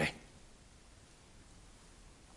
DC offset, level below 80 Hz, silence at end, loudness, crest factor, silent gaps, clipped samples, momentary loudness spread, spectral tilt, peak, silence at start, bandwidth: under 0.1%; -62 dBFS; 0 s; -50 LUFS; 26 dB; none; under 0.1%; 6 LU; -4 dB/octave; -22 dBFS; 0 s; 11.5 kHz